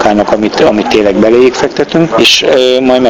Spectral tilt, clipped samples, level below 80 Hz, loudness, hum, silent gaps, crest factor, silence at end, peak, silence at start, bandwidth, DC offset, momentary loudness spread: -4 dB/octave; 2%; -38 dBFS; -7 LUFS; none; none; 8 dB; 0 s; 0 dBFS; 0 s; 19.5 kHz; under 0.1%; 5 LU